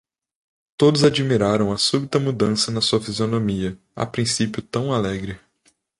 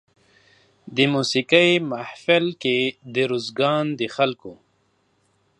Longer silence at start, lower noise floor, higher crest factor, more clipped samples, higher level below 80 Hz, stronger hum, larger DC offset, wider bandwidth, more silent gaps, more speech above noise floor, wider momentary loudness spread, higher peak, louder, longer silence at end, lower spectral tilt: about the same, 0.8 s vs 0.85 s; about the same, -63 dBFS vs -66 dBFS; about the same, 18 dB vs 22 dB; neither; first, -50 dBFS vs -70 dBFS; neither; neither; about the same, 11.5 kHz vs 11 kHz; neither; about the same, 43 dB vs 45 dB; about the same, 12 LU vs 10 LU; about the same, -2 dBFS vs -2 dBFS; about the same, -20 LUFS vs -21 LUFS; second, 0.6 s vs 1.05 s; about the same, -5 dB/octave vs -5 dB/octave